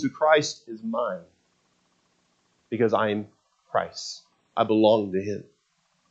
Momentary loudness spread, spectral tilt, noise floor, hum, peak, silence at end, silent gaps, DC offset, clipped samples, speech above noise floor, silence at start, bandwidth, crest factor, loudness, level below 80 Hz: 16 LU; -5 dB/octave; -70 dBFS; none; -4 dBFS; 0.7 s; none; under 0.1%; under 0.1%; 46 dB; 0 s; 8.4 kHz; 22 dB; -25 LUFS; -76 dBFS